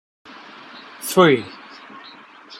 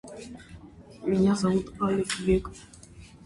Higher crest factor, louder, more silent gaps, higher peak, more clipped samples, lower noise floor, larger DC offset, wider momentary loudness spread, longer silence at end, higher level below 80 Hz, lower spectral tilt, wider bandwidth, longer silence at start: about the same, 20 dB vs 16 dB; first, -17 LUFS vs -26 LUFS; neither; first, -2 dBFS vs -12 dBFS; neither; second, -43 dBFS vs -48 dBFS; neither; first, 26 LU vs 23 LU; second, 0.05 s vs 0.2 s; second, -66 dBFS vs -46 dBFS; about the same, -5 dB/octave vs -6 dB/octave; first, 15.5 kHz vs 11.5 kHz; first, 0.75 s vs 0.05 s